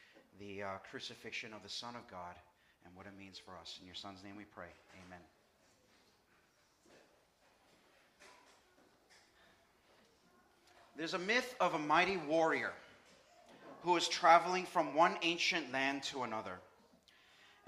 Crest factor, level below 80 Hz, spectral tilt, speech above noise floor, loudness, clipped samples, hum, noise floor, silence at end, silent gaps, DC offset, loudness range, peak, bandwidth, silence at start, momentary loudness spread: 26 dB; -80 dBFS; -3 dB/octave; 35 dB; -35 LUFS; under 0.1%; none; -72 dBFS; 1.05 s; none; under 0.1%; 20 LU; -14 dBFS; 15.5 kHz; 0.4 s; 23 LU